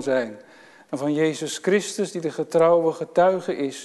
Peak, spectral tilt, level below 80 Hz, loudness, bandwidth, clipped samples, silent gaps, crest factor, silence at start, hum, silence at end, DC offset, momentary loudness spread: -6 dBFS; -5 dB/octave; -76 dBFS; -22 LUFS; 12.5 kHz; under 0.1%; none; 16 dB; 0 s; none; 0 s; under 0.1%; 10 LU